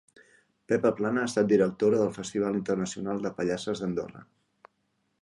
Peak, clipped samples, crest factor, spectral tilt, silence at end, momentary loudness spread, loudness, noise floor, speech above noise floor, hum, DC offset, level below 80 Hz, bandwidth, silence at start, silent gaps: -10 dBFS; under 0.1%; 18 dB; -6 dB/octave; 1 s; 8 LU; -28 LUFS; -75 dBFS; 48 dB; none; under 0.1%; -64 dBFS; 11.5 kHz; 0.7 s; none